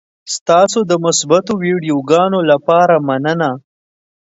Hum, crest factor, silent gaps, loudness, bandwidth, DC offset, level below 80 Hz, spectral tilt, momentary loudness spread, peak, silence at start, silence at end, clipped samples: none; 14 dB; 0.41-0.46 s; -13 LUFS; 8 kHz; under 0.1%; -60 dBFS; -4.5 dB/octave; 8 LU; 0 dBFS; 0.25 s; 0.7 s; under 0.1%